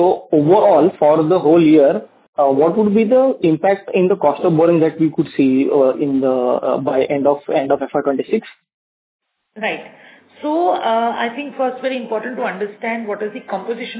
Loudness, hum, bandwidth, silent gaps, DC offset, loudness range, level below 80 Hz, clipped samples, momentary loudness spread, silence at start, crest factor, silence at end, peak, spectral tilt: -16 LUFS; none; 4 kHz; 2.28-2.33 s, 8.74-9.19 s; under 0.1%; 8 LU; -62 dBFS; under 0.1%; 11 LU; 0 s; 16 dB; 0 s; 0 dBFS; -11 dB/octave